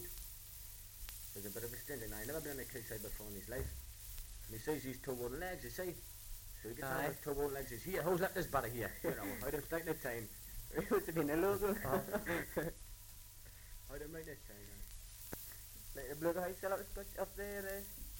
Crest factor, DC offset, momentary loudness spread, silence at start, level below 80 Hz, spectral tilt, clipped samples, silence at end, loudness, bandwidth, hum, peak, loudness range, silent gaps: 20 dB; under 0.1%; 14 LU; 0 s; -56 dBFS; -4.5 dB/octave; under 0.1%; 0 s; -43 LUFS; 17 kHz; none; -24 dBFS; 7 LU; none